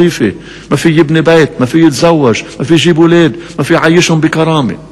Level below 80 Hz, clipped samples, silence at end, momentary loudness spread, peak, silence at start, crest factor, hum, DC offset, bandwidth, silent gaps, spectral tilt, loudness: -40 dBFS; 2%; 0.05 s; 8 LU; 0 dBFS; 0 s; 8 dB; none; under 0.1%; 12.5 kHz; none; -5.5 dB/octave; -9 LUFS